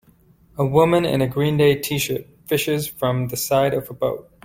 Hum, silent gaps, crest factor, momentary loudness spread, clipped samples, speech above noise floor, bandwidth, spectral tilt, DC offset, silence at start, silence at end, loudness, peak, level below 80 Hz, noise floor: none; none; 18 dB; 8 LU; under 0.1%; 34 dB; 16.5 kHz; -5.5 dB/octave; under 0.1%; 0.55 s; 0.25 s; -20 LUFS; -4 dBFS; -50 dBFS; -54 dBFS